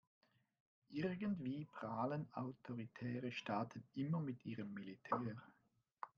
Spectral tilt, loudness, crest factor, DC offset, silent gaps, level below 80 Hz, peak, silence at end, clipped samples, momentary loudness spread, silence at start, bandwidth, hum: -6.5 dB/octave; -46 LUFS; 22 dB; under 0.1%; 5.93-5.97 s; -84 dBFS; -24 dBFS; 0.1 s; under 0.1%; 8 LU; 0.9 s; 7.2 kHz; none